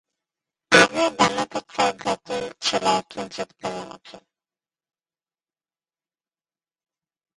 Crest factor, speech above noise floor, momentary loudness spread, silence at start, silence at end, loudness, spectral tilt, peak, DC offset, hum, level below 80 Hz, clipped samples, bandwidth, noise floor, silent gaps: 26 dB; over 66 dB; 17 LU; 0.7 s; 3.2 s; -21 LUFS; -2.5 dB/octave; 0 dBFS; under 0.1%; none; -62 dBFS; under 0.1%; 11.5 kHz; under -90 dBFS; none